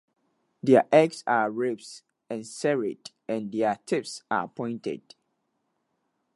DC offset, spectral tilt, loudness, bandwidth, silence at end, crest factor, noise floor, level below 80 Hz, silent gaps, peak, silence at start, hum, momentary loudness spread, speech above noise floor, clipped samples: under 0.1%; -5.5 dB/octave; -26 LUFS; 11.5 kHz; 1.4 s; 22 dB; -76 dBFS; -78 dBFS; none; -6 dBFS; 0.65 s; none; 16 LU; 51 dB; under 0.1%